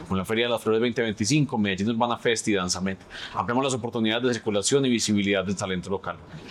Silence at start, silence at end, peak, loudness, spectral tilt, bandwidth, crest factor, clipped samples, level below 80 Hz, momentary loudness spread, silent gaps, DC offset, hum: 0 s; 0 s; -8 dBFS; -25 LUFS; -4.5 dB/octave; 14 kHz; 16 dB; under 0.1%; -60 dBFS; 9 LU; none; under 0.1%; none